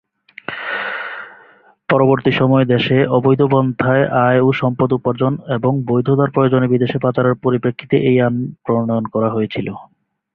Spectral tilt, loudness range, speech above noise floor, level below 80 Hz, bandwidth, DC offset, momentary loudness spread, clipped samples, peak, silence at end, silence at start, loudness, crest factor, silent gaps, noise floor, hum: -10 dB/octave; 3 LU; 33 dB; -52 dBFS; 4.9 kHz; under 0.1%; 12 LU; under 0.1%; -2 dBFS; 0.5 s; 0.5 s; -16 LUFS; 14 dB; none; -48 dBFS; none